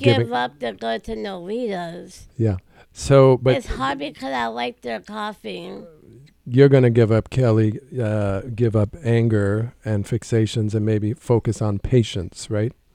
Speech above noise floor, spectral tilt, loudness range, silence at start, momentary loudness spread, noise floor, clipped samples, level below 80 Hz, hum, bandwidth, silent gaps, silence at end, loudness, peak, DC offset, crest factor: 28 dB; -7 dB/octave; 3 LU; 0 s; 15 LU; -48 dBFS; under 0.1%; -42 dBFS; none; 11 kHz; none; 0.2 s; -21 LUFS; -2 dBFS; under 0.1%; 20 dB